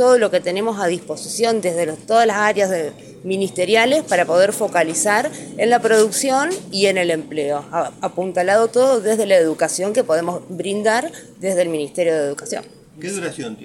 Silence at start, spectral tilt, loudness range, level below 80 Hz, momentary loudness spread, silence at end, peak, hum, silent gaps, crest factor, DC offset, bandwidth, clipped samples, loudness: 0 s; -3.5 dB/octave; 4 LU; -66 dBFS; 11 LU; 0 s; -2 dBFS; none; none; 16 dB; under 0.1%; 16.5 kHz; under 0.1%; -18 LUFS